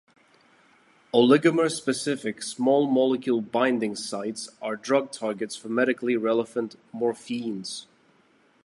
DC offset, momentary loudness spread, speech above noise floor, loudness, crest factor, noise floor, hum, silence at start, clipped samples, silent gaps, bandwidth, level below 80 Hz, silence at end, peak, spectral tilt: under 0.1%; 13 LU; 37 dB; -25 LUFS; 20 dB; -62 dBFS; none; 1.15 s; under 0.1%; none; 11.5 kHz; -76 dBFS; 0.8 s; -6 dBFS; -4.5 dB/octave